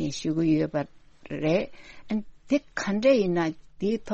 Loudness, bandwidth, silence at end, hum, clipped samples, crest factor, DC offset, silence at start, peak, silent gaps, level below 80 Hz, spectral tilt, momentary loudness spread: -27 LUFS; 8.4 kHz; 0 s; none; under 0.1%; 16 dB; under 0.1%; 0 s; -10 dBFS; none; -56 dBFS; -6 dB/octave; 11 LU